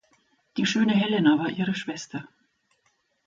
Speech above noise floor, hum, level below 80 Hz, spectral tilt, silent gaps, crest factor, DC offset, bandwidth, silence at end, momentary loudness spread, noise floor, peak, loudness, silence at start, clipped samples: 46 dB; none; -70 dBFS; -5 dB/octave; none; 18 dB; under 0.1%; 7.6 kHz; 1 s; 15 LU; -70 dBFS; -8 dBFS; -24 LUFS; 0.55 s; under 0.1%